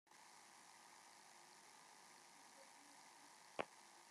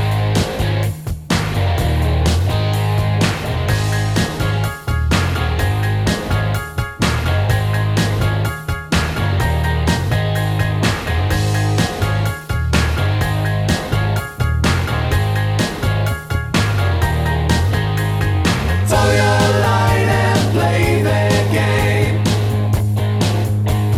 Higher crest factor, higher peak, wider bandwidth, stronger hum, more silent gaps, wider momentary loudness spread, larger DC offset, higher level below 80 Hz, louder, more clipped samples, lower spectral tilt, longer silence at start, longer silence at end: first, 36 dB vs 16 dB; second, -26 dBFS vs 0 dBFS; second, 13 kHz vs 15.5 kHz; neither; neither; first, 11 LU vs 5 LU; neither; second, under -90 dBFS vs -26 dBFS; second, -60 LUFS vs -17 LUFS; neither; second, -1.5 dB/octave vs -5.5 dB/octave; about the same, 0.05 s vs 0 s; about the same, 0 s vs 0 s